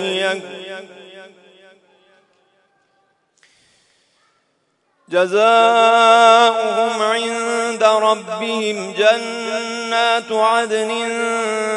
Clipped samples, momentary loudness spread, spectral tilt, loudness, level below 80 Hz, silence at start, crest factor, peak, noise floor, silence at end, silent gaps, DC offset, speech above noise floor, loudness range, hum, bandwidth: under 0.1%; 12 LU; -2.5 dB/octave; -15 LUFS; -82 dBFS; 0 s; 18 dB; 0 dBFS; -65 dBFS; 0 s; none; under 0.1%; 50 dB; 10 LU; none; 10.5 kHz